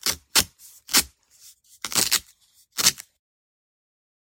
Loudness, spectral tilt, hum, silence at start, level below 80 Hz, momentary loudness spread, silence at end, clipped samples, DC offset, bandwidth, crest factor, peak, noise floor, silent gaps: -21 LUFS; 0.5 dB/octave; none; 0.05 s; -54 dBFS; 15 LU; 1.25 s; under 0.1%; under 0.1%; 17 kHz; 28 dB; 0 dBFS; -59 dBFS; none